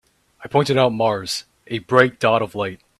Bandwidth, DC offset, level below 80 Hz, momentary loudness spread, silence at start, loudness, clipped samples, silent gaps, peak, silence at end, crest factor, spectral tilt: 13.5 kHz; under 0.1%; -58 dBFS; 11 LU; 0.4 s; -19 LUFS; under 0.1%; none; 0 dBFS; 0.25 s; 20 dB; -5 dB/octave